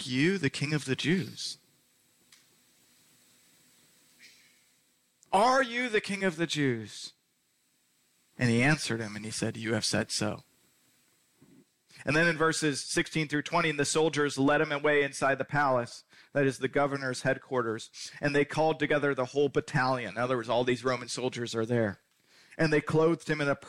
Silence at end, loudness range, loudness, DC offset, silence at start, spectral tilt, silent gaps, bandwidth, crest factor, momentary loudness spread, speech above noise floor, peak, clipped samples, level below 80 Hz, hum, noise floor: 0 s; 6 LU; -29 LUFS; under 0.1%; 0 s; -4.5 dB/octave; none; 15.5 kHz; 16 dB; 10 LU; 44 dB; -16 dBFS; under 0.1%; -62 dBFS; none; -73 dBFS